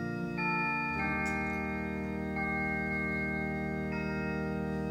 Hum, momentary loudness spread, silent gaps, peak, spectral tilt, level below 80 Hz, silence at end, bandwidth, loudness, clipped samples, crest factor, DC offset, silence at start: none; 5 LU; none; -20 dBFS; -7 dB/octave; -48 dBFS; 0 s; 16 kHz; -33 LUFS; under 0.1%; 14 dB; under 0.1%; 0 s